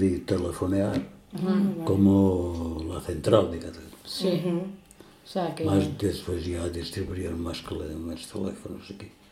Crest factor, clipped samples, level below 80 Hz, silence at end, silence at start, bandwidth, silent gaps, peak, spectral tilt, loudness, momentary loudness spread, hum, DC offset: 22 dB; under 0.1%; -48 dBFS; 0.2 s; 0 s; 15.5 kHz; none; -4 dBFS; -7 dB/octave; -27 LUFS; 17 LU; none; under 0.1%